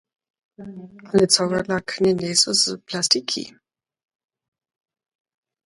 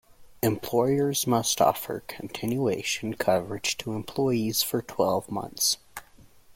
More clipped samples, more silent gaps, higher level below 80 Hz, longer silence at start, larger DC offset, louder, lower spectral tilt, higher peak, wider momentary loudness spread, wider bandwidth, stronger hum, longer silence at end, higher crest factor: neither; neither; about the same, -58 dBFS vs -58 dBFS; first, 0.6 s vs 0.2 s; neither; first, -19 LUFS vs -26 LUFS; about the same, -3 dB/octave vs -4 dB/octave; first, 0 dBFS vs -8 dBFS; first, 22 LU vs 10 LU; second, 11.5 kHz vs 16.5 kHz; neither; first, 2.2 s vs 0.05 s; about the same, 24 dB vs 20 dB